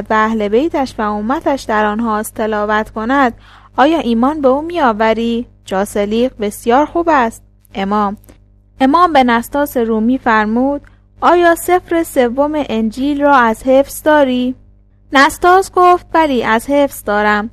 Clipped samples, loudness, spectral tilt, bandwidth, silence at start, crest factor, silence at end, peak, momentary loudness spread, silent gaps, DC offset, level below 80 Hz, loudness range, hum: under 0.1%; -13 LUFS; -4.5 dB/octave; 15 kHz; 0 s; 14 dB; 0.05 s; 0 dBFS; 8 LU; none; under 0.1%; -40 dBFS; 3 LU; 50 Hz at -40 dBFS